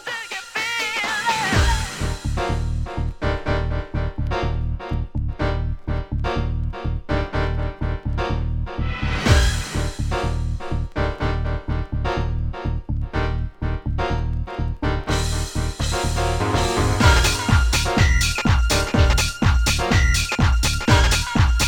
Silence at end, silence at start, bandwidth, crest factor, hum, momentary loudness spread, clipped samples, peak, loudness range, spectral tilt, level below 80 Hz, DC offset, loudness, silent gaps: 0 s; 0 s; 18.5 kHz; 18 dB; none; 9 LU; under 0.1%; -2 dBFS; 7 LU; -4.5 dB/octave; -24 dBFS; under 0.1%; -22 LUFS; none